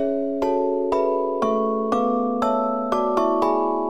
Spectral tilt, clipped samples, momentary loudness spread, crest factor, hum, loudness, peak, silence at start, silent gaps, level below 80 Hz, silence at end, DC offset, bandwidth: -6.5 dB/octave; under 0.1%; 2 LU; 14 dB; none; -22 LUFS; -6 dBFS; 0 s; none; -54 dBFS; 0 s; 0.5%; 12.5 kHz